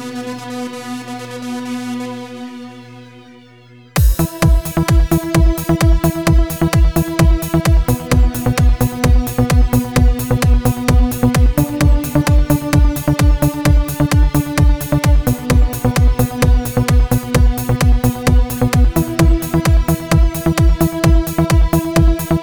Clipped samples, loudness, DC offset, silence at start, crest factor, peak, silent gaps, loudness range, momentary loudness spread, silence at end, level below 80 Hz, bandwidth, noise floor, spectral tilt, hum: under 0.1%; -15 LUFS; 0.5%; 0 s; 12 dB; 0 dBFS; none; 5 LU; 11 LU; 0 s; -16 dBFS; over 20 kHz; -42 dBFS; -6 dB/octave; none